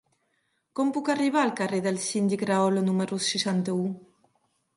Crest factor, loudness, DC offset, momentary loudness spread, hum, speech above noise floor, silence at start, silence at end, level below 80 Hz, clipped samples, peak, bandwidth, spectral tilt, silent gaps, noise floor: 16 dB; -26 LUFS; under 0.1%; 6 LU; none; 48 dB; 0.75 s; 0.75 s; -74 dBFS; under 0.1%; -10 dBFS; 11.5 kHz; -5 dB/octave; none; -74 dBFS